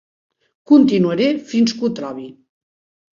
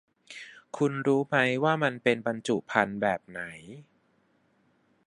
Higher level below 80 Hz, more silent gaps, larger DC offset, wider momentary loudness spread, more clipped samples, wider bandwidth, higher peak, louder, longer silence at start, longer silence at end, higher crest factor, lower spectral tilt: first, -60 dBFS vs -70 dBFS; neither; neither; about the same, 18 LU vs 19 LU; neither; second, 7.4 kHz vs 11.5 kHz; first, -2 dBFS vs -6 dBFS; first, -16 LUFS vs -27 LUFS; first, 0.7 s vs 0.3 s; second, 0.85 s vs 1.25 s; second, 16 dB vs 24 dB; about the same, -6 dB/octave vs -5.5 dB/octave